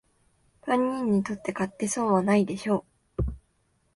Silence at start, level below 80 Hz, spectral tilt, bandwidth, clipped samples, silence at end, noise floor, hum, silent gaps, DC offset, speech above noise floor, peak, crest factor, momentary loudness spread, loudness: 0.65 s; -44 dBFS; -6 dB/octave; 11.5 kHz; under 0.1%; 0.6 s; -69 dBFS; none; none; under 0.1%; 44 dB; -10 dBFS; 18 dB; 10 LU; -27 LUFS